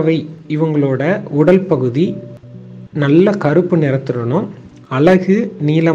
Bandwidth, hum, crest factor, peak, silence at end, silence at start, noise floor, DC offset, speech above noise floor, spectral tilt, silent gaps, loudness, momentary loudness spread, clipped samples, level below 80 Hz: 7.6 kHz; none; 14 dB; 0 dBFS; 0 s; 0 s; -34 dBFS; under 0.1%; 20 dB; -9 dB/octave; none; -14 LUFS; 14 LU; under 0.1%; -52 dBFS